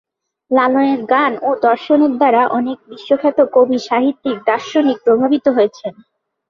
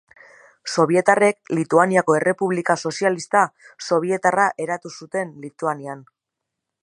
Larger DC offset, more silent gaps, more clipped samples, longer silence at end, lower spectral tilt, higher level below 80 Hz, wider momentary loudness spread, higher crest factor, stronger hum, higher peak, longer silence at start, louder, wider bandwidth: neither; neither; neither; second, 0.6 s vs 0.8 s; about the same, -5.5 dB/octave vs -5 dB/octave; first, -62 dBFS vs -72 dBFS; second, 6 LU vs 13 LU; second, 14 dB vs 20 dB; neither; about the same, -2 dBFS vs 0 dBFS; second, 0.5 s vs 0.65 s; first, -15 LUFS vs -20 LUFS; second, 7.2 kHz vs 11.5 kHz